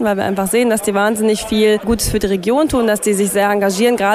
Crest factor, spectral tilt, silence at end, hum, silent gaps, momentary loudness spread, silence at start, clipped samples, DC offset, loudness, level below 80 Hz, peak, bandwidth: 12 dB; -4 dB/octave; 0 s; none; none; 2 LU; 0 s; under 0.1%; under 0.1%; -15 LUFS; -36 dBFS; -2 dBFS; 16 kHz